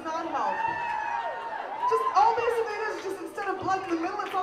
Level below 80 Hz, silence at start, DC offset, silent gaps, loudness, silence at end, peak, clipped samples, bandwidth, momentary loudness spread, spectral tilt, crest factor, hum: -66 dBFS; 0 s; under 0.1%; none; -28 LUFS; 0 s; -10 dBFS; under 0.1%; 15 kHz; 11 LU; -4 dB/octave; 18 dB; none